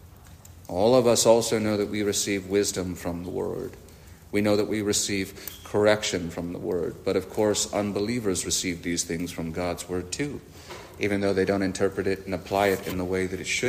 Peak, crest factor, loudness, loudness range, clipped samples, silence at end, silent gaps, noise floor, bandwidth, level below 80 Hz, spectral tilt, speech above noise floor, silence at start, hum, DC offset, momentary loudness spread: -6 dBFS; 20 dB; -26 LUFS; 5 LU; under 0.1%; 0 s; none; -48 dBFS; 15.5 kHz; -54 dBFS; -4 dB/octave; 22 dB; 0 s; none; under 0.1%; 11 LU